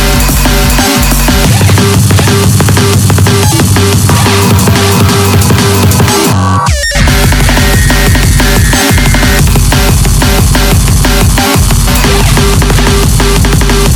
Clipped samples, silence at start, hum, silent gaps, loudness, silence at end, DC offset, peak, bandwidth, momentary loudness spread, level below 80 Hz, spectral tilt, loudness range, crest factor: 6%; 0 s; none; none; -6 LUFS; 0 s; under 0.1%; 0 dBFS; over 20 kHz; 1 LU; -12 dBFS; -4.5 dB/octave; 1 LU; 6 dB